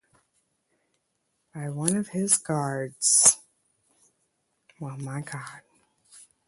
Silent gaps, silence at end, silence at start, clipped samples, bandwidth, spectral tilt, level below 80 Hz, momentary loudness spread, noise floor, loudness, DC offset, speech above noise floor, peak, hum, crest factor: none; 0.3 s; 1.55 s; under 0.1%; 12 kHz; -3 dB/octave; -70 dBFS; 22 LU; -76 dBFS; -23 LUFS; under 0.1%; 50 dB; -2 dBFS; none; 28 dB